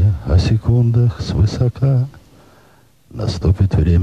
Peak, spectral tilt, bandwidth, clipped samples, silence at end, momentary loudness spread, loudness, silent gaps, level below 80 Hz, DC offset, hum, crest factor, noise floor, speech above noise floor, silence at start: -2 dBFS; -8 dB/octave; 8.6 kHz; under 0.1%; 0 s; 9 LU; -16 LUFS; none; -26 dBFS; 0.2%; none; 14 dB; -51 dBFS; 36 dB; 0 s